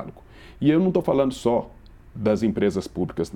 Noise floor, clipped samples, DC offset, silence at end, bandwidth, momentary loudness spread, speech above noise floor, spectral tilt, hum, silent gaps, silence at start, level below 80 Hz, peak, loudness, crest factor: -45 dBFS; under 0.1%; under 0.1%; 0 s; 13 kHz; 13 LU; 24 dB; -7.5 dB/octave; none; none; 0 s; -48 dBFS; -6 dBFS; -23 LUFS; 18 dB